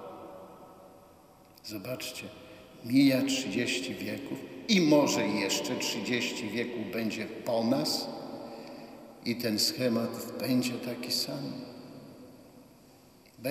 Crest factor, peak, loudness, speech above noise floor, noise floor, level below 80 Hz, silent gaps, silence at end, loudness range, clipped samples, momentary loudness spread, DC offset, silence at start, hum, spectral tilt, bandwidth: 22 dB; -10 dBFS; -30 LUFS; 27 dB; -57 dBFS; -72 dBFS; none; 0 s; 6 LU; under 0.1%; 22 LU; under 0.1%; 0 s; none; -4 dB/octave; 15.5 kHz